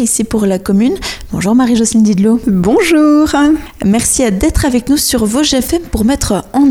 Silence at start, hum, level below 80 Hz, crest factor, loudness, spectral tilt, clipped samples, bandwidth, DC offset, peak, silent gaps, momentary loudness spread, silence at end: 0 s; none; -28 dBFS; 10 dB; -11 LUFS; -4.5 dB/octave; under 0.1%; 18 kHz; under 0.1%; 0 dBFS; none; 5 LU; 0 s